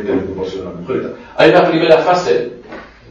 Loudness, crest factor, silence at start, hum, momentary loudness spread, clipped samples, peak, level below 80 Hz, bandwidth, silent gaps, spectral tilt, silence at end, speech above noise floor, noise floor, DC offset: -13 LUFS; 14 dB; 0 s; none; 19 LU; 0.1%; 0 dBFS; -48 dBFS; 8 kHz; none; -6 dB/octave; 0.25 s; 21 dB; -34 dBFS; under 0.1%